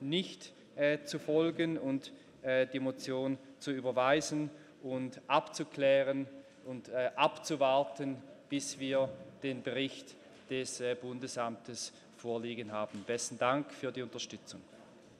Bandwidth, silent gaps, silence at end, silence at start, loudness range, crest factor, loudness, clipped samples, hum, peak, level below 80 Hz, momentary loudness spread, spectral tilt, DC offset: 13.5 kHz; none; 0.05 s; 0 s; 6 LU; 22 dB; -35 LUFS; under 0.1%; none; -14 dBFS; -80 dBFS; 15 LU; -4 dB/octave; under 0.1%